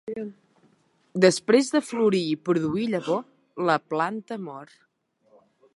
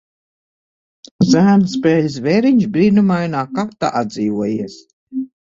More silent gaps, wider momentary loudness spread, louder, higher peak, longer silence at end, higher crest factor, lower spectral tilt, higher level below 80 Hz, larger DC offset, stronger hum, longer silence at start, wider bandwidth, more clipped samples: second, none vs 4.93-5.07 s; first, 15 LU vs 12 LU; second, -24 LUFS vs -15 LUFS; about the same, -4 dBFS vs -2 dBFS; first, 1.1 s vs 0.25 s; first, 22 dB vs 14 dB; second, -5 dB/octave vs -7 dB/octave; second, -70 dBFS vs -54 dBFS; neither; neither; second, 0.05 s vs 1.2 s; first, 11.5 kHz vs 7.6 kHz; neither